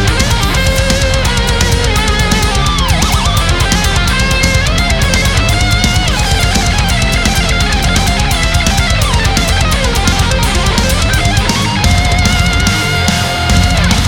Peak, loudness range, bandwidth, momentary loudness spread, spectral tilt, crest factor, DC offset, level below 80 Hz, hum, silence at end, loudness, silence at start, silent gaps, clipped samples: 0 dBFS; 0 LU; 19 kHz; 1 LU; -3.5 dB/octave; 10 dB; under 0.1%; -16 dBFS; none; 0 s; -11 LUFS; 0 s; none; under 0.1%